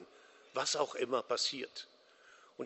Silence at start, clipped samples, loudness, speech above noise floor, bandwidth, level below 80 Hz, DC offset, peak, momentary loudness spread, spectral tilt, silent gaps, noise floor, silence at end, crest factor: 0 s; under 0.1%; -36 LUFS; 26 dB; 8.2 kHz; -86 dBFS; under 0.1%; -18 dBFS; 17 LU; -1.5 dB/octave; none; -63 dBFS; 0 s; 22 dB